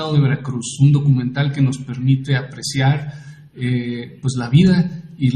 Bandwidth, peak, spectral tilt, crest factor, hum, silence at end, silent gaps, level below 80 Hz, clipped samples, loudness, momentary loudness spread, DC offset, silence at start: 10 kHz; -2 dBFS; -6.5 dB/octave; 14 dB; none; 0 s; none; -48 dBFS; under 0.1%; -18 LUFS; 11 LU; under 0.1%; 0 s